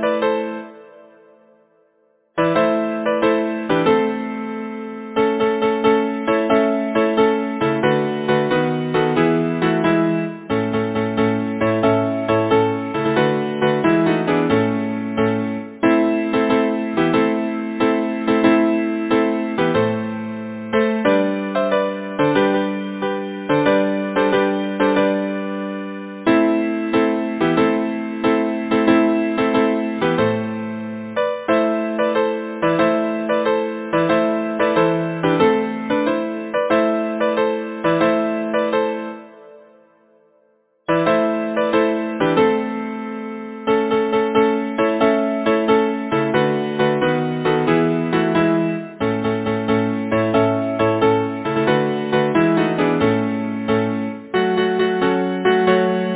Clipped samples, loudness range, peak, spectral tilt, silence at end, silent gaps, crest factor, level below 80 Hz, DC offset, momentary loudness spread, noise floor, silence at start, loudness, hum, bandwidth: under 0.1%; 2 LU; -2 dBFS; -10.5 dB/octave; 0 s; none; 18 dB; -54 dBFS; under 0.1%; 7 LU; -60 dBFS; 0 s; -19 LUFS; none; 4 kHz